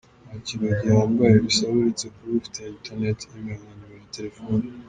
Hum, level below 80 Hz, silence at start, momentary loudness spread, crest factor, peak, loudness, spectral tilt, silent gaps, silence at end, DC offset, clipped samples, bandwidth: none; -52 dBFS; 0.25 s; 18 LU; 20 dB; -4 dBFS; -22 LUFS; -5.5 dB/octave; none; 0 s; under 0.1%; under 0.1%; 9.6 kHz